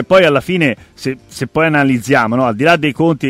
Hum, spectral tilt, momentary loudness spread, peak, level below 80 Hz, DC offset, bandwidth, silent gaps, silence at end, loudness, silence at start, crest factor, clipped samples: none; -6 dB/octave; 12 LU; 0 dBFS; -46 dBFS; under 0.1%; 16 kHz; none; 0 s; -13 LUFS; 0 s; 12 dB; under 0.1%